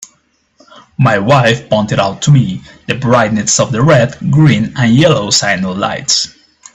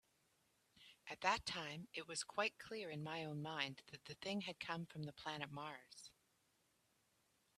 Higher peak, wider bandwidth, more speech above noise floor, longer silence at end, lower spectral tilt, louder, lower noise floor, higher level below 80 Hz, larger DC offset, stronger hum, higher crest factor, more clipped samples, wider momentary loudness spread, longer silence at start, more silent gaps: first, 0 dBFS vs -22 dBFS; second, 8.4 kHz vs 14 kHz; first, 46 dB vs 34 dB; second, 0.45 s vs 1.45 s; about the same, -4.5 dB/octave vs -3.5 dB/octave; first, -11 LUFS vs -46 LUFS; second, -56 dBFS vs -81 dBFS; first, -44 dBFS vs -78 dBFS; neither; neither; second, 12 dB vs 26 dB; neither; second, 7 LU vs 17 LU; second, 0 s vs 0.75 s; neither